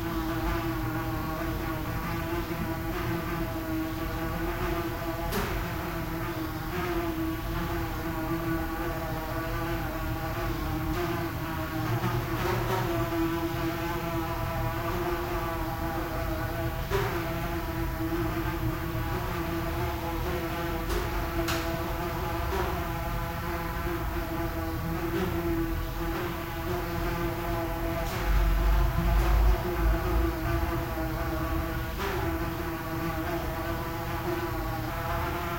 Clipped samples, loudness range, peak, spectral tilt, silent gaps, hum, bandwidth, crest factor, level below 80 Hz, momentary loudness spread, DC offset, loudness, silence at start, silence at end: under 0.1%; 4 LU; -14 dBFS; -6 dB/octave; none; none; 16.5 kHz; 16 dB; -34 dBFS; 4 LU; 0.2%; -31 LUFS; 0 s; 0 s